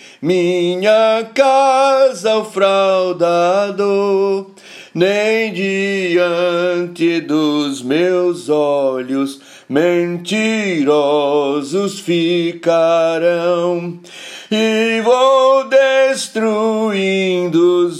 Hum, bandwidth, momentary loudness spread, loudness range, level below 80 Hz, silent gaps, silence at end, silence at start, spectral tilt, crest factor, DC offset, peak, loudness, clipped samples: none; 13.5 kHz; 7 LU; 3 LU; -70 dBFS; none; 0 s; 0.05 s; -5 dB/octave; 14 dB; under 0.1%; 0 dBFS; -15 LUFS; under 0.1%